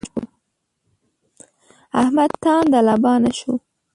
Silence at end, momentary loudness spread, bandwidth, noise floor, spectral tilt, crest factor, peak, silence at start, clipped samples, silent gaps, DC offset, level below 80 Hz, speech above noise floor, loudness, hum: 0.35 s; 14 LU; 11.5 kHz; -73 dBFS; -5.5 dB/octave; 16 dB; -4 dBFS; 0.05 s; under 0.1%; none; under 0.1%; -56 dBFS; 57 dB; -17 LUFS; none